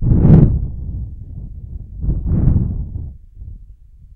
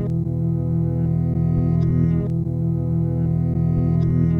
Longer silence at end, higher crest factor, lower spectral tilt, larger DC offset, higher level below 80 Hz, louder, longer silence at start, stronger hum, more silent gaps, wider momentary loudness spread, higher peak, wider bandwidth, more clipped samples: first, 0.5 s vs 0 s; about the same, 16 dB vs 12 dB; about the same, -13 dB/octave vs -12 dB/octave; neither; first, -22 dBFS vs -34 dBFS; first, -16 LUFS vs -21 LUFS; about the same, 0 s vs 0 s; neither; neither; first, 26 LU vs 4 LU; first, 0 dBFS vs -8 dBFS; about the same, 2.6 kHz vs 2.4 kHz; neither